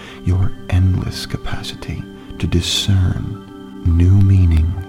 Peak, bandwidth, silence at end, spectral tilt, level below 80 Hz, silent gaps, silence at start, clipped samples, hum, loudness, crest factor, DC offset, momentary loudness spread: -2 dBFS; 12.5 kHz; 0 s; -6 dB/octave; -26 dBFS; none; 0 s; under 0.1%; none; -17 LUFS; 14 dB; under 0.1%; 16 LU